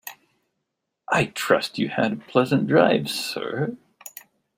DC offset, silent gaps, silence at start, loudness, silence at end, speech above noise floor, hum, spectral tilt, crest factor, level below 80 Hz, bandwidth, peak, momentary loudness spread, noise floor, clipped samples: under 0.1%; none; 0.05 s; -22 LUFS; 0.5 s; 58 dB; none; -5 dB/octave; 20 dB; -64 dBFS; 16 kHz; -4 dBFS; 22 LU; -80 dBFS; under 0.1%